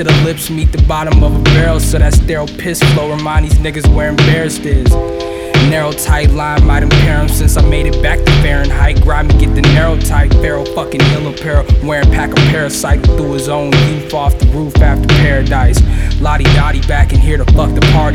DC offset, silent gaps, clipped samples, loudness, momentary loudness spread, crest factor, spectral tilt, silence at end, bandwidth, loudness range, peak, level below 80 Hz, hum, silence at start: under 0.1%; none; under 0.1%; -11 LUFS; 5 LU; 8 dB; -5.5 dB/octave; 0 s; 16 kHz; 1 LU; 0 dBFS; -12 dBFS; none; 0 s